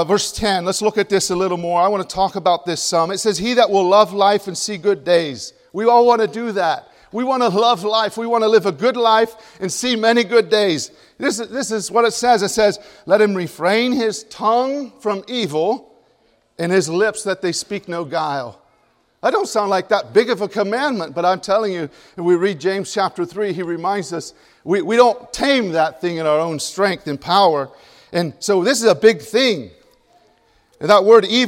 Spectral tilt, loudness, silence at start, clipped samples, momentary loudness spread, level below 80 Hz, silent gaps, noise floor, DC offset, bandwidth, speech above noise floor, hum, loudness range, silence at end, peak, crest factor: -3.5 dB/octave; -17 LUFS; 0 s; under 0.1%; 10 LU; -54 dBFS; none; -59 dBFS; under 0.1%; 16.5 kHz; 42 dB; none; 4 LU; 0 s; 0 dBFS; 18 dB